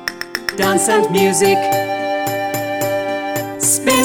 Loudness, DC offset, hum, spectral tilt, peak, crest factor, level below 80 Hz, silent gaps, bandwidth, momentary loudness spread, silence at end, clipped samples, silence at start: -16 LUFS; under 0.1%; none; -3 dB/octave; -4 dBFS; 14 dB; -54 dBFS; none; over 20 kHz; 8 LU; 0 s; under 0.1%; 0 s